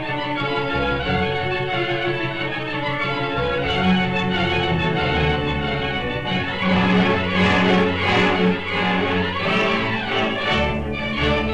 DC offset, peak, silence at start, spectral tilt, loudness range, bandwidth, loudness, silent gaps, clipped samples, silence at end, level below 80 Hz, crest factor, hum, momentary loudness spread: under 0.1%; -4 dBFS; 0 s; -6.5 dB/octave; 4 LU; 8.8 kHz; -20 LUFS; none; under 0.1%; 0 s; -38 dBFS; 16 dB; none; 6 LU